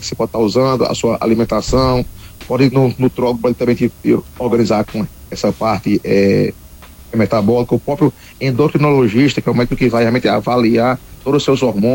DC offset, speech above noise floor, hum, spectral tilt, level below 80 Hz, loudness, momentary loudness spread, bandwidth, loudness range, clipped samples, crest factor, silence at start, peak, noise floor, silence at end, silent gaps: under 0.1%; 23 dB; none; -6.5 dB/octave; -36 dBFS; -15 LUFS; 7 LU; 17 kHz; 2 LU; under 0.1%; 12 dB; 0 s; -2 dBFS; -37 dBFS; 0 s; none